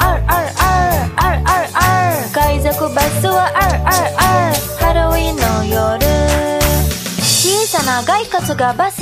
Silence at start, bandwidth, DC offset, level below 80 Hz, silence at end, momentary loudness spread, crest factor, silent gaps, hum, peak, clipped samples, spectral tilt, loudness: 0 s; 15.5 kHz; under 0.1%; -22 dBFS; 0 s; 3 LU; 14 dB; none; none; 0 dBFS; under 0.1%; -4 dB/octave; -14 LUFS